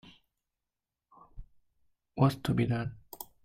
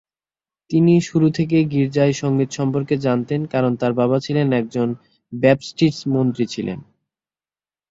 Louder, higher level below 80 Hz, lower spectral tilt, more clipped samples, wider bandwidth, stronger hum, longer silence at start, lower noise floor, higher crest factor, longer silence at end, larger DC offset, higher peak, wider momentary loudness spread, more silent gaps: second, -30 LUFS vs -19 LUFS; about the same, -56 dBFS vs -56 dBFS; about the same, -7.5 dB/octave vs -7 dB/octave; neither; first, 16 kHz vs 7.8 kHz; neither; second, 0.05 s vs 0.7 s; about the same, -89 dBFS vs under -90 dBFS; first, 24 dB vs 18 dB; second, 0.2 s vs 1.1 s; neither; second, -12 dBFS vs -2 dBFS; first, 18 LU vs 8 LU; neither